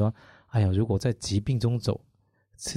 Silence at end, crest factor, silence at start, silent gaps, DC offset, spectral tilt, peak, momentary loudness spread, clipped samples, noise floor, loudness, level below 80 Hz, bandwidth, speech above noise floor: 0 s; 14 dB; 0 s; none; under 0.1%; -6.5 dB/octave; -14 dBFS; 12 LU; under 0.1%; -64 dBFS; -27 LUFS; -52 dBFS; 12.5 kHz; 39 dB